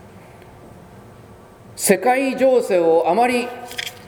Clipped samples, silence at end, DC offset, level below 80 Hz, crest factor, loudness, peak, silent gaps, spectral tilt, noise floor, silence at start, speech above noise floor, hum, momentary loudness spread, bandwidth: under 0.1%; 0 s; under 0.1%; -56 dBFS; 20 dB; -18 LUFS; 0 dBFS; none; -4 dB/octave; -43 dBFS; 0.15 s; 26 dB; none; 12 LU; over 20 kHz